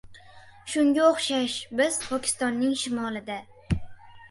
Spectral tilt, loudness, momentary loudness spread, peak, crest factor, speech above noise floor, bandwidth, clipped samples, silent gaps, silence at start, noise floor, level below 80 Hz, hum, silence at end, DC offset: -4 dB/octave; -26 LUFS; 12 LU; -8 dBFS; 18 dB; 24 dB; 11.5 kHz; under 0.1%; none; 0.05 s; -50 dBFS; -48 dBFS; none; 0.05 s; under 0.1%